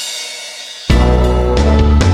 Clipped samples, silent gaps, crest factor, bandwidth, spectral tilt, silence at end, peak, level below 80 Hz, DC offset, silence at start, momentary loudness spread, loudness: under 0.1%; none; 12 dB; 12.5 kHz; -6 dB/octave; 0 s; 0 dBFS; -14 dBFS; under 0.1%; 0 s; 13 LU; -13 LUFS